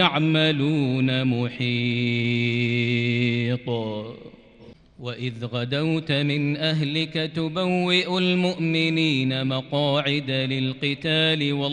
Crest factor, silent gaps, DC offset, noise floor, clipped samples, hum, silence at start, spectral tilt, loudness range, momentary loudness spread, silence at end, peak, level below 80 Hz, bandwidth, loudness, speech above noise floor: 18 dB; none; under 0.1%; -49 dBFS; under 0.1%; none; 0 s; -6.5 dB/octave; 5 LU; 8 LU; 0 s; -6 dBFS; -60 dBFS; 9.8 kHz; -23 LUFS; 26 dB